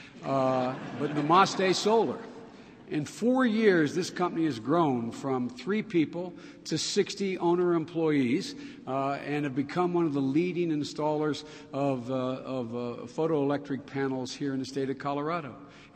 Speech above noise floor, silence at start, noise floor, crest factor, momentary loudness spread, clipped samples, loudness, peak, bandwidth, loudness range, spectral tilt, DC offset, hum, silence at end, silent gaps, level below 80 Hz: 20 dB; 0 s; -49 dBFS; 20 dB; 11 LU; under 0.1%; -29 LUFS; -8 dBFS; 13.5 kHz; 5 LU; -5.5 dB/octave; under 0.1%; none; 0.1 s; none; -70 dBFS